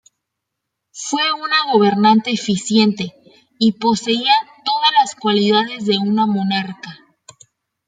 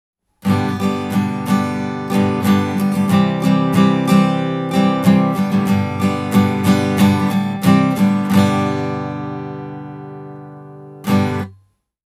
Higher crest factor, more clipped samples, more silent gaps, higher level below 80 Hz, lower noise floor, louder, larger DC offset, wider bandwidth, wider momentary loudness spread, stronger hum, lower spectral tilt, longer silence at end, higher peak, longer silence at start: about the same, 16 dB vs 16 dB; neither; neither; about the same, -62 dBFS vs -60 dBFS; first, -79 dBFS vs -54 dBFS; about the same, -16 LUFS vs -16 LUFS; neither; second, 9.4 kHz vs 15.5 kHz; second, 10 LU vs 16 LU; neither; second, -4.5 dB/octave vs -7 dB/octave; first, 0.95 s vs 0.6 s; about the same, -2 dBFS vs 0 dBFS; first, 0.95 s vs 0.45 s